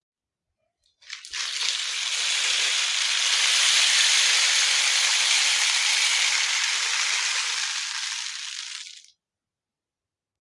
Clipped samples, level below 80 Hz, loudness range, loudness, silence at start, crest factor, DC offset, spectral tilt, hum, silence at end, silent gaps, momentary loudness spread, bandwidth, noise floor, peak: under 0.1%; -80 dBFS; 8 LU; -20 LUFS; 1.05 s; 22 dB; under 0.1%; 7 dB/octave; none; 1.45 s; none; 15 LU; 12 kHz; -90 dBFS; -4 dBFS